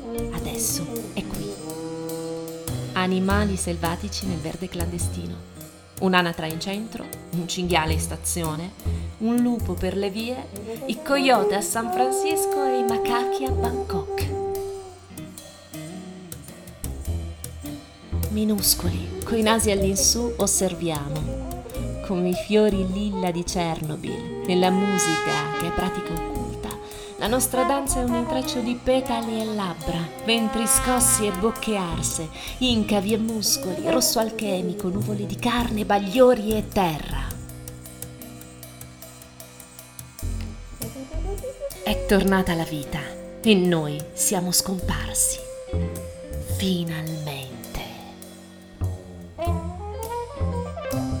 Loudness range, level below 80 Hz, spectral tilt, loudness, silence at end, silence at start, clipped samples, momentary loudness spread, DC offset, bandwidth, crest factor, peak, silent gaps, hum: 10 LU; -38 dBFS; -4 dB/octave; -24 LUFS; 0 s; 0 s; under 0.1%; 18 LU; under 0.1%; 19.5 kHz; 24 dB; -2 dBFS; none; none